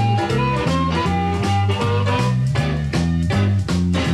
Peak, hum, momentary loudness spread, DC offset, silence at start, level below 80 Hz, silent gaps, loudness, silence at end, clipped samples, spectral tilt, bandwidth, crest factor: -6 dBFS; none; 1 LU; under 0.1%; 0 s; -34 dBFS; none; -19 LUFS; 0 s; under 0.1%; -6.5 dB/octave; 12 kHz; 12 dB